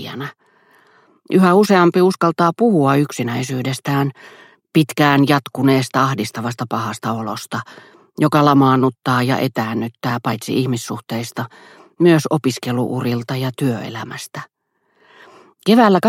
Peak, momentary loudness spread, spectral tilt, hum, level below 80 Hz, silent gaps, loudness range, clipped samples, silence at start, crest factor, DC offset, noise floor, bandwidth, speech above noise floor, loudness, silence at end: 0 dBFS; 15 LU; -6 dB/octave; none; -60 dBFS; none; 4 LU; under 0.1%; 0 s; 18 dB; under 0.1%; -65 dBFS; 16.5 kHz; 49 dB; -17 LUFS; 0 s